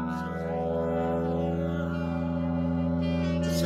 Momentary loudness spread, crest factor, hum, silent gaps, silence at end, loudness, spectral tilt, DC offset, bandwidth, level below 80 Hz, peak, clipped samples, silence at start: 3 LU; 12 dB; none; none; 0 s; -29 LUFS; -7.5 dB/octave; under 0.1%; 14.5 kHz; -44 dBFS; -16 dBFS; under 0.1%; 0 s